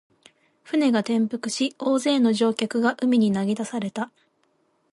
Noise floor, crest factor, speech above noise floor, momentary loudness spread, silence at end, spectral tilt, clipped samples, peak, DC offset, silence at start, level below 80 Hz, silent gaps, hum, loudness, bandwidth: -67 dBFS; 16 dB; 45 dB; 9 LU; 0.85 s; -5 dB/octave; under 0.1%; -8 dBFS; under 0.1%; 0.7 s; -70 dBFS; none; none; -23 LUFS; 11.5 kHz